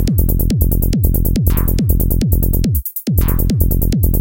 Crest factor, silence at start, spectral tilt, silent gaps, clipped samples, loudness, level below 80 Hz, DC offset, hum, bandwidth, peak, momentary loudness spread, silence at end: 12 dB; 0 s; -7 dB/octave; none; under 0.1%; -16 LUFS; -16 dBFS; 2%; none; 17.5 kHz; 0 dBFS; 1 LU; 0 s